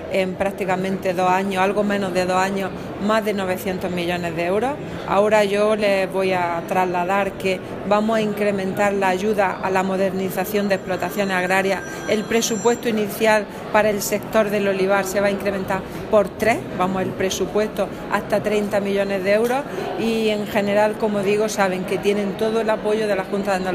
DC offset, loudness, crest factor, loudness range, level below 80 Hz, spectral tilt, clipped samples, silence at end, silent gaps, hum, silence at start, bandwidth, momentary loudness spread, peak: under 0.1%; -20 LUFS; 18 dB; 2 LU; -48 dBFS; -5 dB/octave; under 0.1%; 0 s; none; none; 0 s; 15.5 kHz; 5 LU; -2 dBFS